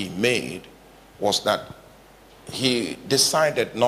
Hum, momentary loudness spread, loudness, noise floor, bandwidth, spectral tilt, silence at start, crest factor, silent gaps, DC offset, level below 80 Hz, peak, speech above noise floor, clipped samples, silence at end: none; 16 LU; -22 LUFS; -50 dBFS; 15.5 kHz; -3 dB/octave; 0 s; 18 dB; none; under 0.1%; -58 dBFS; -6 dBFS; 27 dB; under 0.1%; 0 s